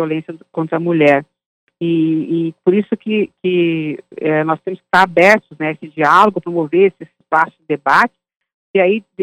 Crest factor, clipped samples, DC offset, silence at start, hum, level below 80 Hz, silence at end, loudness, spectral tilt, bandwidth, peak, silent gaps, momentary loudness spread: 16 dB; under 0.1%; under 0.1%; 0 s; none; -62 dBFS; 0 s; -15 LUFS; -6.5 dB/octave; 13.5 kHz; 0 dBFS; 1.46-1.67 s, 8.54-8.74 s; 11 LU